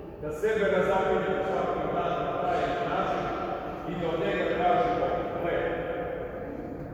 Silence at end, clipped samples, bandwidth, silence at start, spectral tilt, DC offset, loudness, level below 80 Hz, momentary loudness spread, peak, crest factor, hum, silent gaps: 0 s; under 0.1%; 15.5 kHz; 0 s; -6.5 dB/octave; under 0.1%; -29 LUFS; -48 dBFS; 10 LU; -14 dBFS; 14 dB; none; none